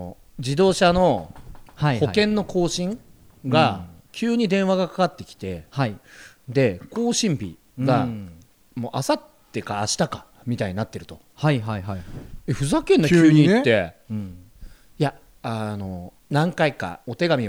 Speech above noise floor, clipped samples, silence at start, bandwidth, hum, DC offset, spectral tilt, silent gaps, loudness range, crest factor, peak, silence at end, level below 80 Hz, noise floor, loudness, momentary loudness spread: 22 dB; under 0.1%; 0 s; 16.5 kHz; none; under 0.1%; -5.5 dB/octave; none; 7 LU; 18 dB; -4 dBFS; 0 s; -48 dBFS; -43 dBFS; -22 LUFS; 18 LU